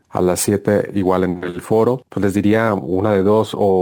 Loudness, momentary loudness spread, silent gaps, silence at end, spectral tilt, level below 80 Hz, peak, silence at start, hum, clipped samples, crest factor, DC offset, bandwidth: -17 LUFS; 4 LU; none; 0 s; -6 dB/octave; -52 dBFS; -2 dBFS; 0.15 s; none; under 0.1%; 14 dB; under 0.1%; over 20 kHz